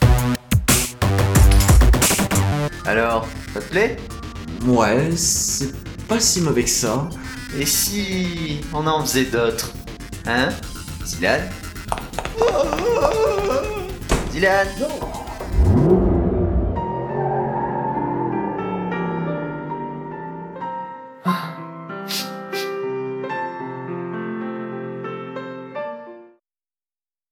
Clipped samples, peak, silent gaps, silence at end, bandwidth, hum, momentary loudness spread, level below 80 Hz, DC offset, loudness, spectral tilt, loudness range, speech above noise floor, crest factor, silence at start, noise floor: under 0.1%; -2 dBFS; none; 1.05 s; 19 kHz; none; 15 LU; -28 dBFS; under 0.1%; -20 LUFS; -4.5 dB/octave; 10 LU; over 70 dB; 18 dB; 0 s; under -90 dBFS